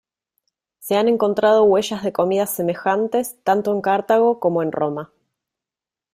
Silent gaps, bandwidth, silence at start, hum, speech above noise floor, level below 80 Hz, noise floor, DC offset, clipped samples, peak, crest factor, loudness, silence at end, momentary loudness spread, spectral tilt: none; 16 kHz; 0.8 s; none; 71 dB; -64 dBFS; -89 dBFS; under 0.1%; under 0.1%; -4 dBFS; 16 dB; -19 LUFS; 1.1 s; 8 LU; -5 dB/octave